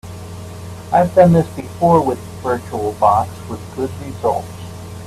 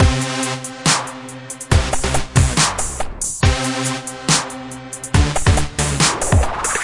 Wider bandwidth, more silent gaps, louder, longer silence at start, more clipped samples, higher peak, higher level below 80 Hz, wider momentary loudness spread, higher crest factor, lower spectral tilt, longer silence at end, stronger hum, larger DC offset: first, 14 kHz vs 11.5 kHz; neither; about the same, -17 LUFS vs -18 LUFS; about the same, 0.05 s vs 0 s; neither; about the same, 0 dBFS vs -2 dBFS; second, -46 dBFS vs -26 dBFS; first, 20 LU vs 13 LU; about the same, 18 dB vs 16 dB; first, -7.5 dB/octave vs -3.5 dB/octave; about the same, 0 s vs 0 s; neither; neither